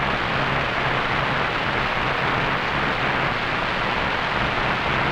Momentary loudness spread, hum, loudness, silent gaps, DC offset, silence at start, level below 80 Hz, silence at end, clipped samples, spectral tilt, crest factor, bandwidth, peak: 1 LU; none; -22 LUFS; none; under 0.1%; 0 s; -38 dBFS; 0 s; under 0.1%; -5 dB/octave; 14 dB; 19.5 kHz; -8 dBFS